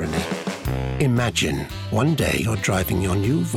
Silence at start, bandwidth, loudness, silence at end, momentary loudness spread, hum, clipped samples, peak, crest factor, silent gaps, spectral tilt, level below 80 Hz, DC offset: 0 s; 18 kHz; -22 LUFS; 0 s; 7 LU; none; under 0.1%; -8 dBFS; 14 dB; none; -5.5 dB/octave; -36 dBFS; under 0.1%